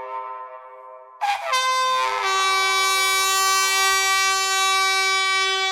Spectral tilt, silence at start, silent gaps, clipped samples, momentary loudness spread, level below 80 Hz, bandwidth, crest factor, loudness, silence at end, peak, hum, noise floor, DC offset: 2 dB/octave; 0 s; none; under 0.1%; 11 LU; -60 dBFS; 19 kHz; 16 dB; -18 LUFS; 0 s; -4 dBFS; none; -42 dBFS; under 0.1%